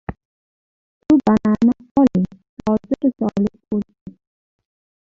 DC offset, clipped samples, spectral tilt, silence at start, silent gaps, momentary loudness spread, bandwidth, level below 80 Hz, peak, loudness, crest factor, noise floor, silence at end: under 0.1%; under 0.1%; -9 dB/octave; 0.1 s; 0.25-1.01 s, 1.91-1.95 s, 2.49-2.57 s, 4.01-4.06 s; 12 LU; 7.2 kHz; -48 dBFS; -4 dBFS; -19 LUFS; 16 dB; under -90 dBFS; 0.95 s